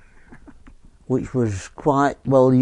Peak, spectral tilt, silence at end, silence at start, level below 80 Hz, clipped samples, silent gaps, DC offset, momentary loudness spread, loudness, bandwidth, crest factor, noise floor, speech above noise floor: -4 dBFS; -8 dB/octave; 0 s; 0.3 s; -48 dBFS; under 0.1%; none; under 0.1%; 9 LU; -20 LUFS; 10.5 kHz; 18 dB; -46 dBFS; 28 dB